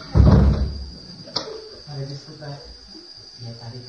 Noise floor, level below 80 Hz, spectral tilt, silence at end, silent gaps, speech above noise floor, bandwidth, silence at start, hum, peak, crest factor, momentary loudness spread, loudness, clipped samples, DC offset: -42 dBFS; -26 dBFS; -7.5 dB/octave; 0.05 s; none; 7 dB; 6.8 kHz; 0 s; none; -2 dBFS; 20 dB; 24 LU; -20 LUFS; under 0.1%; under 0.1%